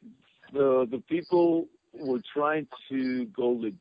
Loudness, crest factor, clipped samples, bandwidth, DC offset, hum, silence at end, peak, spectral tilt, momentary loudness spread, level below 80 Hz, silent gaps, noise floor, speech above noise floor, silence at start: -28 LUFS; 14 dB; under 0.1%; 5.2 kHz; under 0.1%; none; 0.05 s; -14 dBFS; -9.5 dB/octave; 10 LU; -72 dBFS; none; -54 dBFS; 27 dB; 0.05 s